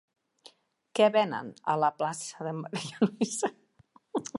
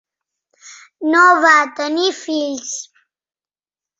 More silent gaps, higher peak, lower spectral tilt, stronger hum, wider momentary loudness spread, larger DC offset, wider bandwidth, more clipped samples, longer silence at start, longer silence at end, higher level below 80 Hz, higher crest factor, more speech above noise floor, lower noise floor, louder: neither; second, -10 dBFS vs -2 dBFS; first, -4.5 dB/octave vs -0.5 dB/octave; neither; second, 12 LU vs 15 LU; neither; first, 11.5 kHz vs 8 kHz; neither; first, 0.95 s vs 0.65 s; second, 0 s vs 1.15 s; second, -80 dBFS vs -72 dBFS; first, 22 dB vs 16 dB; second, 34 dB vs over 75 dB; second, -63 dBFS vs under -90 dBFS; second, -30 LUFS vs -14 LUFS